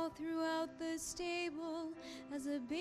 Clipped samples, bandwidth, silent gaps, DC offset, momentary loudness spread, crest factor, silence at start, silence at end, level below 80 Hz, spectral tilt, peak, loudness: under 0.1%; 14.5 kHz; none; under 0.1%; 8 LU; 14 dB; 0 s; 0 s; -70 dBFS; -3 dB/octave; -28 dBFS; -42 LUFS